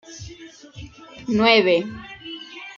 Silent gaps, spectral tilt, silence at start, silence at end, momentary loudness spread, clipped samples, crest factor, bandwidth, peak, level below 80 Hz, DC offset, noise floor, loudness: none; -4.5 dB/octave; 0.1 s; 0.05 s; 26 LU; under 0.1%; 22 dB; 7.4 kHz; -2 dBFS; -52 dBFS; under 0.1%; -43 dBFS; -18 LUFS